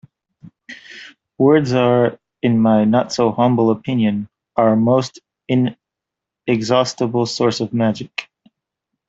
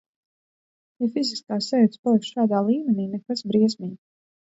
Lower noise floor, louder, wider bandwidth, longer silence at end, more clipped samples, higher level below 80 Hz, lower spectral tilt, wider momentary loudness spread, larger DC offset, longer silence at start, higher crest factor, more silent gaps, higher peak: second, -84 dBFS vs under -90 dBFS; first, -17 LUFS vs -23 LUFS; about the same, 8 kHz vs 8 kHz; first, 0.85 s vs 0.55 s; neither; first, -58 dBFS vs -72 dBFS; about the same, -6.5 dB/octave vs -6.5 dB/octave; first, 15 LU vs 8 LU; neither; second, 0.45 s vs 1 s; about the same, 16 dB vs 16 dB; second, none vs 1.99-2.03 s; first, 0 dBFS vs -8 dBFS